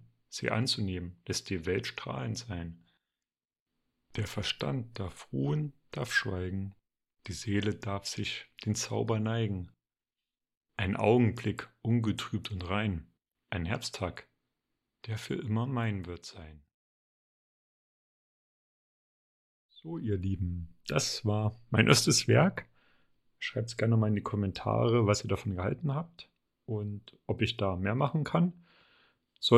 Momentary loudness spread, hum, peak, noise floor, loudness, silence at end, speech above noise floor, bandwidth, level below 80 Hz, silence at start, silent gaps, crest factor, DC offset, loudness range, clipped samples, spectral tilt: 15 LU; none; -6 dBFS; under -90 dBFS; -32 LUFS; 0 s; over 59 dB; 14 kHz; -58 dBFS; 0.3 s; 3.60-3.66 s, 10.57-10.61 s, 16.74-19.69 s; 26 dB; under 0.1%; 10 LU; under 0.1%; -5 dB/octave